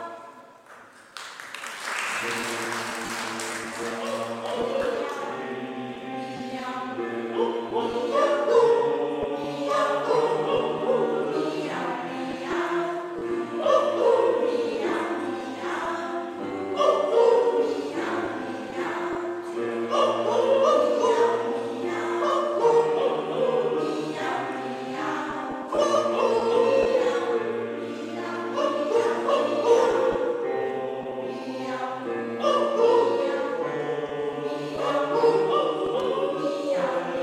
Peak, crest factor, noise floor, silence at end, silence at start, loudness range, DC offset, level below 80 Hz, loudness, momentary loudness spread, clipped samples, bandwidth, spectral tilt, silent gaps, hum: -8 dBFS; 16 dB; -49 dBFS; 0 s; 0 s; 6 LU; under 0.1%; -66 dBFS; -25 LUFS; 11 LU; under 0.1%; 14 kHz; -4.5 dB/octave; none; none